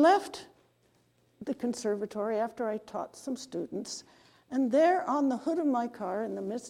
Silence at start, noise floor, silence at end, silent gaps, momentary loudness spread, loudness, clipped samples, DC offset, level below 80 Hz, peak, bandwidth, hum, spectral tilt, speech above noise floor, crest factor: 0 s; -69 dBFS; 0 s; none; 14 LU; -31 LUFS; under 0.1%; under 0.1%; -76 dBFS; -12 dBFS; 15 kHz; none; -4.5 dB/octave; 39 dB; 20 dB